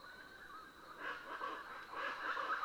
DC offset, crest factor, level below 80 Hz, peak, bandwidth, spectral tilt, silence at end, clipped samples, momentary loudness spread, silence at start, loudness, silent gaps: under 0.1%; 16 dB; -76 dBFS; -30 dBFS; over 20 kHz; -2.5 dB/octave; 0 s; under 0.1%; 13 LU; 0 s; -46 LUFS; none